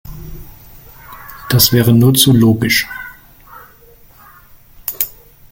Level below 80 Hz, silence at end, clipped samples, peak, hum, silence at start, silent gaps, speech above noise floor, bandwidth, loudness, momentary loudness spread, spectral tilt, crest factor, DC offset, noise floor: -40 dBFS; 0.45 s; under 0.1%; 0 dBFS; none; 0.05 s; none; 33 dB; 17 kHz; -12 LUFS; 24 LU; -4.5 dB/octave; 16 dB; under 0.1%; -43 dBFS